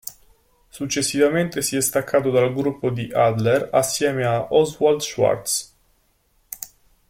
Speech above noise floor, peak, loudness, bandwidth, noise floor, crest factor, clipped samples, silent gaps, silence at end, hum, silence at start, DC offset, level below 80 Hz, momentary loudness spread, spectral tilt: 43 dB; -4 dBFS; -20 LUFS; 16.5 kHz; -63 dBFS; 18 dB; under 0.1%; none; 0.45 s; none; 0.05 s; under 0.1%; -56 dBFS; 15 LU; -4 dB/octave